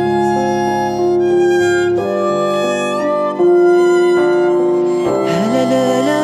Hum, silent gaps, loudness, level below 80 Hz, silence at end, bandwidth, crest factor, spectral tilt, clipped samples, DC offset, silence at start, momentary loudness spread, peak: none; none; -14 LUFS; -52 dBFS; 0 s; 12 kHz; 12 dB; -6 dB/octave; under 0.1%; under 0.1%; 0 s; 5 LU; -2 dBFS